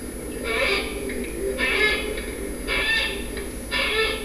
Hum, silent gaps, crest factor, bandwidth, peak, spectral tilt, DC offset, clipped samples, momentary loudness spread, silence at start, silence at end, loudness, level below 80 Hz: 50 Hz at -40 dBFS; none; 18 dB; 11 kHz; -8 dBFS; -3 dB/octave; 0.2%; under 0.1%; 10 LU; 0 s; 0 s; -24 LUFS; -36 dBFS